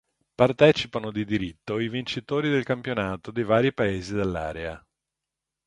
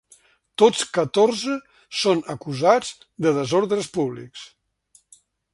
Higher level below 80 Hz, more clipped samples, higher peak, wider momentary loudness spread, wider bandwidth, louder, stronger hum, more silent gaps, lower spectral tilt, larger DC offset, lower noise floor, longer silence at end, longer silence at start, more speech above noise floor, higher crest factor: first, -50 dBFS vs -64 dBFS; neither; about the same, -2 dBFS vs -2 dBFS; second, 11 LU vs 16 LU; about the same, 11 kHz vs 11.5 kHz; second, -25 LUFS vs -21 LUFS; neither; neither; first, -6.5 dB/octave vs -4.5 dB/octave; neither; first, -86 dBFS vs -60 dBFS; second, 0.9 s vs 1.05 s; second, 0.4 s vs 0.6 s; first, 62 dB vs 39 dB; about the same, 24 dB vs 22 dB